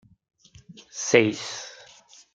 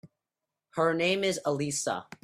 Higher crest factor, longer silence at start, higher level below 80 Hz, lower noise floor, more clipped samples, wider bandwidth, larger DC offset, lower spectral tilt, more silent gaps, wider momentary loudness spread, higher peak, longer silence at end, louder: first, 26 dB vs 18 dB; first, 0.7 s vs 0.05 s; about the same, -70 dBFS vs -70 dBFS; second, -53 dBFS vs -88 dBFS; neither; second, 9.4 kHz vs 15.5 kHz; neither; about the same, -3.5 dB/octave vs -3.5 dB/octave; neither; first, 20 LU vs 7 LU; first, -2 dBFS vs -12 dBFS; first, 0.6 s vs 0.2 s; first, -23 LUFS vs -29 LUFS